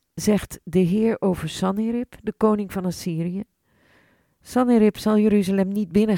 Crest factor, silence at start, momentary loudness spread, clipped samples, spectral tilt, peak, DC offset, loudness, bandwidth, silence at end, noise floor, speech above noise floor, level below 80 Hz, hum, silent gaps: 16 dB; 0.15 s; 9 LU; under 0.1%; -7 dB/octave; -6 dBFS; under 0.1%; -22 LUFS; 16.5 kHz; 0 s; -60 dBFS; 39 dB; -50 dBFS; none; none